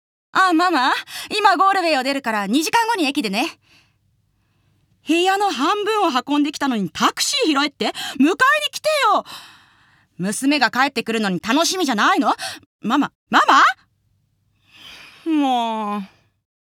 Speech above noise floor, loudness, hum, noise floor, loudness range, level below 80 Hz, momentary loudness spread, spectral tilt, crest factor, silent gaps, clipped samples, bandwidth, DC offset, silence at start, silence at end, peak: 46 dB; -18 LUFS; none; -65 dBFS; 4 LU; -68 dBFS; 11 LU; -3 dB/octave; 18 dB; 12.66-12.79 s, 13.15-13.27 s; under 0.1%; 19 kHz; under 0.1%; 0.35 s; 0.75 s; -2 dBFS